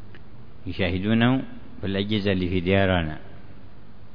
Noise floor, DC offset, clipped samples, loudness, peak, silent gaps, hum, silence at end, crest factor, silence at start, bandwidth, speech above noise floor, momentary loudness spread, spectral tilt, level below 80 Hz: -48 dBFS; 2%; under 0.1%; -24 LUFS; -6 dBFS; none; none; 0.1 s; 20 dB; 0 s; 5.4 kHz; 24 dB; 16 LU; -9 dB/octave; -46 dBFS